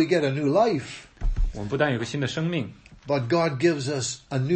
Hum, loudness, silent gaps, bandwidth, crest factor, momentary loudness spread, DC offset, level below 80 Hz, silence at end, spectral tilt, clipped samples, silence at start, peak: none; -25 LUFS; none; 8.8 kHz; 16 dB; 11 LU; under 0.1%; -34 dBFS; 0 s; -5.5 dB/octave; under 0.1%; 0 s; -8 dBFS